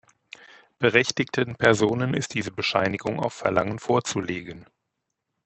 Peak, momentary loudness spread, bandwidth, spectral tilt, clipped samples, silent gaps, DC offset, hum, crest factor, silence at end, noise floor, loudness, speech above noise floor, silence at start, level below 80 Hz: -2 dBFS; 9 LU; 8.4 kHz; -4.5 dB/octave; under 0.1%; none; under 0.1%; none; 24 dB; 0.8 s; -81 dBFS; -24 LUFS; 56 dB; 0.8 s; -60 dBFS